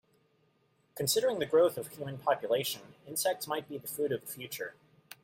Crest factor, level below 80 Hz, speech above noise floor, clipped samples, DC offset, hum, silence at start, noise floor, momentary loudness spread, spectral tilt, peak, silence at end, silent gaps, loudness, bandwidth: 18 dB; -74 dBFS; 39 dB; under 0.1%; under 0.1%; none; 0.95 s; -72 dBFS; 13 LU; -3 dB/octave; -14 dBFS; 0.55 s; none; -32 LUFS; 16.5 kHz